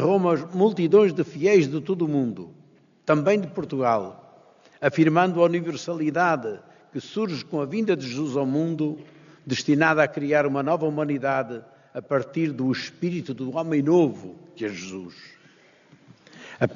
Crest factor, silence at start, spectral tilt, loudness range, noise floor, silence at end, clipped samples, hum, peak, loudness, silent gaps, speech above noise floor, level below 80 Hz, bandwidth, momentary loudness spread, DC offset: 20 dB; 0 s; -5.5 dB/octave; 5 LU; -56 dBFS; 0 s; under 0.1%; none; -4 dBFS; -23 LUFS; none; 33 dB; -70 dBFS; 7.2 kHz; 17 LU; under 0.1%